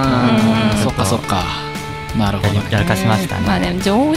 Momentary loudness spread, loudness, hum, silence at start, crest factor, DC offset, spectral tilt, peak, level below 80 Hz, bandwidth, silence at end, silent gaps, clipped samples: 9 LU; -16 LUFS; none; 0 s; 14 dB; 0.5%; -5.5 dB/octave; -2 dBFS; -32 dBFS; 16 kHz; 0 s; none; under 0.1%